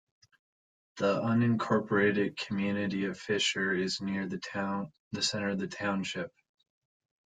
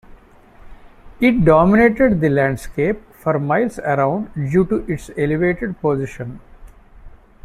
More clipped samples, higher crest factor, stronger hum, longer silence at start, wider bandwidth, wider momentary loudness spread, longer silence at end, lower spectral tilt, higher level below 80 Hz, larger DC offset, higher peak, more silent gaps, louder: neither; about the same, 18 dB vs 16 dB; neither; first, 0.95 s vs 0.65 s; second, 9.6 kHz vs 14.5 kHz; second, 8 LU vs 11 LU; first, 1 s vs 0.35 s; second, -4.5 dB/octave vs -8 dB/octave; second, -70 dBFS vs -38 dBFS; neither; second, -14 dBFS vs -2 dBFS; first, 4.99-5.11 s vs none; second, -31 LUFS vs -17 LUFS